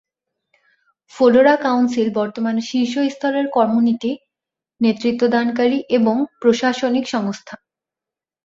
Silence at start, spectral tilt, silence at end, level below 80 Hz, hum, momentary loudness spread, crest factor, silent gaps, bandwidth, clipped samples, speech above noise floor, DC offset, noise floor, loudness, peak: 1.15 s; -5.5 dB/octave; 0.9 s; -64 dBFS; none; 8 LU; 16 dB; none; 7.6 kHz; under 0.1%; 71 dB; under 0.1%; -88 dBFS; -18 LUFS; -2 dBFS